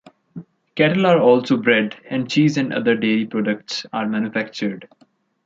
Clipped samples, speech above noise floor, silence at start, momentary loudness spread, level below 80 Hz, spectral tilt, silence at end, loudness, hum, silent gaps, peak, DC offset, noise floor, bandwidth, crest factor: under 0.1%; 21 dB; 0.35 s; 15 LU; -66 dBFS; -6 dB/octave; 0.6 s; -19 LUFS; none; none; -2 dBFS; under 0.1%; -39 dBFS; 7.8 kHz; 18 dB